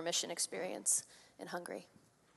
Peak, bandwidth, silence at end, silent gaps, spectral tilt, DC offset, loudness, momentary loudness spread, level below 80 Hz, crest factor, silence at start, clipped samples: -20 dBFS; 12.5 kHz; 0.5 s; none; -1 dB/octave; under 0.1%; -37 LUFS; 17 LU; -88 dBFS; 22 dB; 0 s; under 0.1%